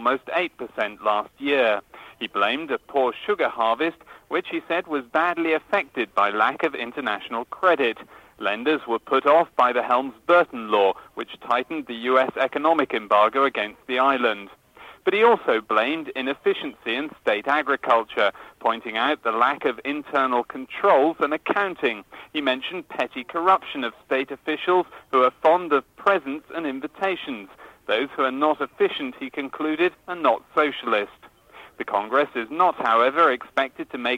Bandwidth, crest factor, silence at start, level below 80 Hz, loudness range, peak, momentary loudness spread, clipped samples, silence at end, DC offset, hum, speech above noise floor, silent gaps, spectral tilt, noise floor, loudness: 16 kHz; 18 dB; 0 s; -66 dBFS; 3 LU; -6 dBFS; 10 LU; under 0.1%; 0 s; under 0.1%; none; 26 dB; none; -5 dB/octave; -48 dBFS; -23 LUFS